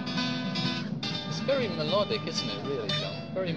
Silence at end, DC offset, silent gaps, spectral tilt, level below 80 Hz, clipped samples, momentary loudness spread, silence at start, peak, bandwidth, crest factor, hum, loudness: 0 s; 0.2%; none; -5 dB/octave; -60 dBFS; under 0.1%; 4 LU; 0 s; -14 dBFS; 9.6 kHz; 16 dB; none; -30 LUFS